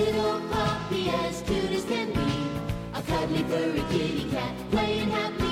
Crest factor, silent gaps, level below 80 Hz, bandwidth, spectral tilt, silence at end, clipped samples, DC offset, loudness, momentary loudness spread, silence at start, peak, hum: 14 dB; none; -44 dBFS; 16 kHz; -5.5 dB/octave; 0 s; under 0.1%; under 0.1%; -28 LUFS; 4 LU; 0 s; -14 dBFS; none